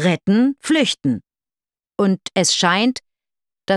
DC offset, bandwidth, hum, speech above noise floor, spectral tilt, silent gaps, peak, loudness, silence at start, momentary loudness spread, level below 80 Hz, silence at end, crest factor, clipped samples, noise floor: under 0.1%; 12.5 kHz; none; over 73 dB; -4 dB/octave; none; -2 dBFS; -18 LUFS; 0 s; 14 LU; -62 dBFS; 0 s; 18 dB; under 0.1%; under -90 dBFS